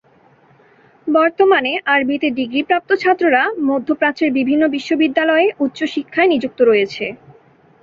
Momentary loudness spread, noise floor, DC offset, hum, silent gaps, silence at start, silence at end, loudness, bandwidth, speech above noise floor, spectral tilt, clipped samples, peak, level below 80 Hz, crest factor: 6 LU; -51 dBFS; under 0.1%; none; none; 1.05 s; 0.7 s; -16 LUFS; 7.4 kHz; 36 dB; -5 dB/octave; under 0.1%; -2 dBFS; -62 dBFS; 16 dB